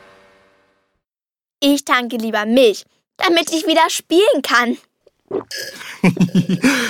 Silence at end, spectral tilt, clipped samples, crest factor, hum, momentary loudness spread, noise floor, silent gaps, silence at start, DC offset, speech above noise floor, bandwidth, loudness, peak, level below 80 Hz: 0 s; -4.5 dB/octave; under 0.1%; 18 dB; none; 14 LU; under -90 dBFS; none; 1.6 s; under 0.1%; over 74 dB; 19 kHz; -16 LUFS; 0 dBFS; -56 dBFS